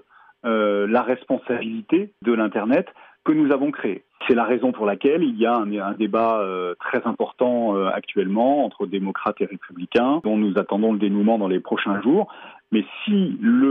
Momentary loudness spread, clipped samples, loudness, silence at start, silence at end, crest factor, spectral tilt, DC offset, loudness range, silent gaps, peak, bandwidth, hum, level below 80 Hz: 7 LU; under 0.1%; -22 LUFS; 0.45 s; 0 s; 14 dB; -5 dB/octave; under 0.1%; 1 LU; none; -6 dBFS; 4.8 kHz; none; -70 dBFS